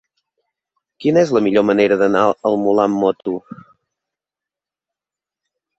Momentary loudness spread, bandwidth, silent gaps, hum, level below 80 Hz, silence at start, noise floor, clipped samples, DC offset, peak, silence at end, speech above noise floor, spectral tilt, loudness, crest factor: 9 LU; 8 kHz; none; none; -60 dBFS; 1 s; -88 dBFS; under 0.1%; under 0.1%; -2 dBFS; 2.25 s; 73 dB; -6.5 dB/octave; -16 LUFS; 18 dB